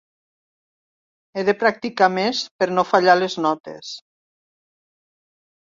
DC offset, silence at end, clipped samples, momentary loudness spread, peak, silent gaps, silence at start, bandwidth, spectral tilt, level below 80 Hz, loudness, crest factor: under 0.1%; 1.8 s; under 0.1%; 17 LU; -2 dBFS; 2.51-2.59 s, 3.60-3.64 s; 1.35 s; 7.6 kHz; -4.5 dB/octave; -70 dBFS; -19 LUFS; 20 dB